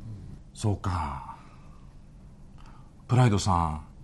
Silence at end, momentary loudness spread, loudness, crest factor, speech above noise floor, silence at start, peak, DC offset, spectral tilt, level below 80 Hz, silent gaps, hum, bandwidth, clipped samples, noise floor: 0 s; 22 LU; -27 LUFS; 20 dB; 23 dB; 0 s; -10 dBFS; under 0.1%; -6.5 dB/octave; -46 dBFS; none; none; 12 kHz; under 0.1%; -48 dBFS